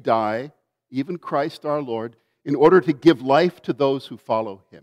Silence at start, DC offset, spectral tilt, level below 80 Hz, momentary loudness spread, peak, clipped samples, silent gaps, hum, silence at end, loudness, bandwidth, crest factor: 0.05 s; under 0.1%; -7.5 dB/octave; -62 dBFS; 16 LU; -4 dBFS; under 0.1%; none; none; 0.05 s; -21 LUFS; 11 kHz; 18 dB